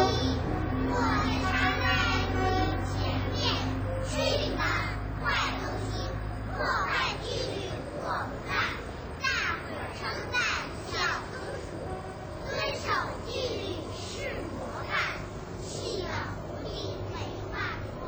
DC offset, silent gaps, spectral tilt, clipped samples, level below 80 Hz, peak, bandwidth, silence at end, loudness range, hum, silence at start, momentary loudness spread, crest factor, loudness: under 0.1%; none; -5 dB/octave; under 0.1%; -40 dBFS; -12 dBFS; over 20 kHz; 0 s; 6 LU; none; 0 s; 10 LU; 18 dB; -31 LUFS